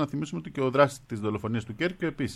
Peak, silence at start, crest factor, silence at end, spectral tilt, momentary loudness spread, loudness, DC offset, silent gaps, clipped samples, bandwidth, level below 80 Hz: -8 dBFS; 0 s; 20 dB; 0 s; -6.5 dB/octave; 10 LU; -28 LUFS; under 0.1%; none; under 0.1%; 13.5 kHz; -58 dBFS